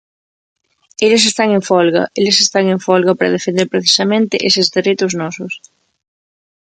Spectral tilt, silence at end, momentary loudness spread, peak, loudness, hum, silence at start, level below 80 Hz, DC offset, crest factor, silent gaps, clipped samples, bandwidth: -3.5 dB/octave; 1.05 s; 11 LU; 0 dBFS; -13 LUFS; none; 1 s; -62 dBFS; under 0.1%; 14 dB; none; under 0.1%; 9.4 kHz